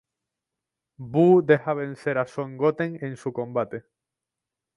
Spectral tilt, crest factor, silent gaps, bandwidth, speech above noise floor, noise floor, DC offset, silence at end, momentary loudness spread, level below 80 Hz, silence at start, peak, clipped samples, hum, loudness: -8.5 dB/octave; 22 dB; none; 11 kHz; 64 dB; -87 dBFS; under 0.1%; 0.95 s; 14 LU; -68 dBFS; 1 s; -4 dBFS; under 0.1%; none; -24 LUFS